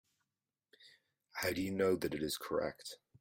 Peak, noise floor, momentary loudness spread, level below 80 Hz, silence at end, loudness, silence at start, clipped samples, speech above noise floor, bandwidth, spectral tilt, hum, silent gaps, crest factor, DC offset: -20 dBFS; under -90 dBFS; 15 LU; -70 dBFS; 0.25 s; -37 LUFS; 0.8 s; under 0.1%; over 53 dB; 16.5 kHz; -4.5 dB/octave; none; none; 20 dB; under 0.1%